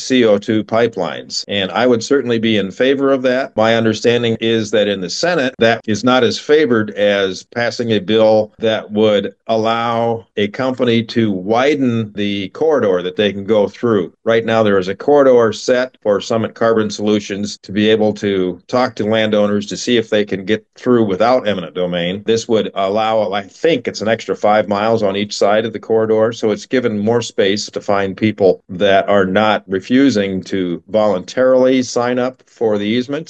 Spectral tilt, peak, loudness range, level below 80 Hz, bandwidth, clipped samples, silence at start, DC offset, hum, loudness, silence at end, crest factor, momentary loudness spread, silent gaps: -5 dB/octave; 0 dBFS; 2 LU; -62 dBFS; 8.6 kHz; under 0.1%; 0 s; under 0.1%; none; -15 LUFS; 0.05 s; 14 dB; 7 LU; none